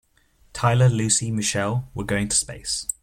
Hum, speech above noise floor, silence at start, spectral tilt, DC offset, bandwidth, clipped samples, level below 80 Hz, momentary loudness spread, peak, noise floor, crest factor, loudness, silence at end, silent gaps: none; 37 dB; 0.55 s; -4 dB/octave; under 0.1%; 15.5 kHz; under 0.1%; -46 dBFS; 8 LU; -4 dBFS; -59 dBFS; 18 dB; -22 LUFS; 0.1 s; none